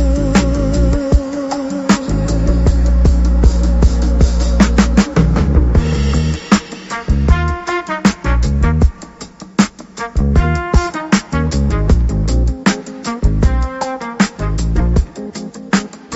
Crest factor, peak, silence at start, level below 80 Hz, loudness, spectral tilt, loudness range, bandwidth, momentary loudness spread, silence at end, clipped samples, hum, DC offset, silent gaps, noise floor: 14 dB; 0 dBFS; 0 s; -16 dBFS; -15 LUFS; -6 dB/octave; 4 LU; 8.2 kHz; 8 LU; 0 s; under 0.1%; none; under 0.1%; none; -34 dBFS